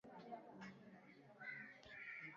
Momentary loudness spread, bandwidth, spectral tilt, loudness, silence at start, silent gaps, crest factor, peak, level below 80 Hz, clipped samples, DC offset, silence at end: 11 LU; 7.2 kHz; -3 dB/octave; -56 LUFS; 0.05 s; none; 18 dB; -40 dBFS; -88 dBFS; under 0.1%; under 0.1%; 0 s